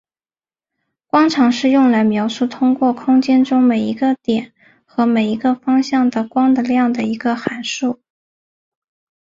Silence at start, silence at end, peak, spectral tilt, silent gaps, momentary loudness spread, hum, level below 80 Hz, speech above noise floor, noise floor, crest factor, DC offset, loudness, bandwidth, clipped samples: 1.15 s; 1.25 s; -2 dBFS; -5.5 dB/octave; none; 8 LU; none; -62 dBFS; over 75 dB; under -90 dBFS; 14 dB; under 0.1%; -16 LUFS; 7.6 kHz; under 0.1%